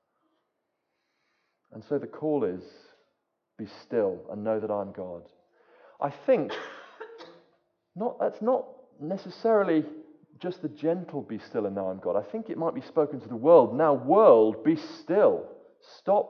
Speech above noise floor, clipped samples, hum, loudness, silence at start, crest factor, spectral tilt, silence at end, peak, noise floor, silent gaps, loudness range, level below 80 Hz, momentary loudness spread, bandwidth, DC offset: 54 dB; under 0.1%; none; -26 LUFS; 1.75 s; 22 dB; -8.5 dB/octave; 0 s; -6 dBFS; -80 dBFS; none; 11 LU; -72 dBFS; 22 LU; 6.4 kHz; under 0.1%